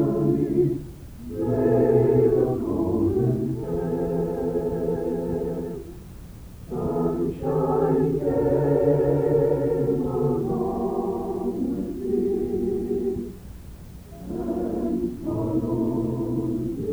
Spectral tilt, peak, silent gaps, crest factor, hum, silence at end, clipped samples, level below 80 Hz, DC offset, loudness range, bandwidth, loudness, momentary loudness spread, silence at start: -10 dB/octave; -8 dBFS; none; 16 dB; none; 0 s; under 0.1%; -42 dBFS; under 0.1%; 6 LU; over 20 kHz; -24 LUFS; 16 LU; 0 s